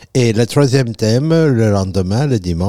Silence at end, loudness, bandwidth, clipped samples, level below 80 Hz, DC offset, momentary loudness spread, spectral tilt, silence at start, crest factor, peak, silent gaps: 0 s; -14 LUFS; 14 kHz; under 0.1%; -44 dBFS; 1%; 4 LU; -6.5 dB/octave; 0 s; 12 dB; -2 dBFS; none